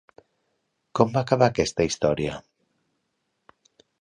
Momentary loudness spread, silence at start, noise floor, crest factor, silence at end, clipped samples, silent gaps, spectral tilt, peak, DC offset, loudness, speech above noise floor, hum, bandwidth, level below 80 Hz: 11 LU; 0.95 s; -76 dBFS; 24 dB; 1.65 s; under 0.1%; none; -5.5 dB/octave; -2 dBFS; under 0.1%; -23 LUFS; 54 dB; none; 11 kHz; -52 dBFS